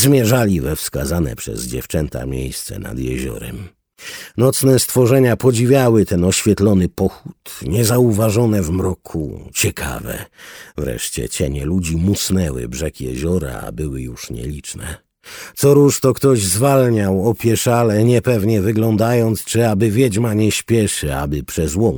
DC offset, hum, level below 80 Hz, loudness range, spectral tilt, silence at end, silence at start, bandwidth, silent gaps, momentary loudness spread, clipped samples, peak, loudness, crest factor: under 0.1%; none; -34 dBFS; 8 LU; -5.5 dB/octave; 0 s; 0 s; over 20 kHz; none; 15 LU; under 0.1%; -2 dBFS; -17 LUFS; 16 dB